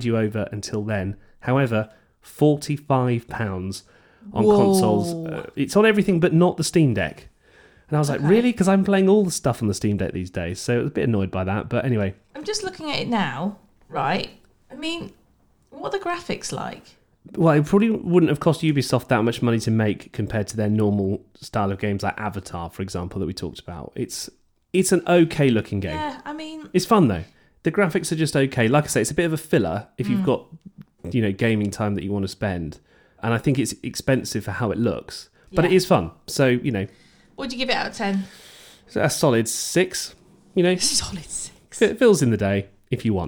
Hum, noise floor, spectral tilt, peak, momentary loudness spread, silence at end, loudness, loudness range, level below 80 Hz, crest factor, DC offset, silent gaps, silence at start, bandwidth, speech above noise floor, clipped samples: none; -60 dBFS; -5.5 dB/octave; -4 dBFS; 14 LU; 0 s; -22 LUFS; 6 LU; -50 dBFS; 18 dB; under 0.1%; none; 0 s; 19.5 kHz; 39 dB; under 0.1%